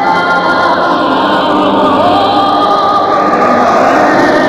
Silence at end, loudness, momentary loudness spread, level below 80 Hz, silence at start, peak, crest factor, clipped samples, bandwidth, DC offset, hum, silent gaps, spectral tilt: 0 s; -9 LUFS; 2 LU; -44 dBFS; 0 s; 0 dBFS; 8 dB; 0.1%; 13.5 kHz; 0.3%; none; none; -5 dB/octave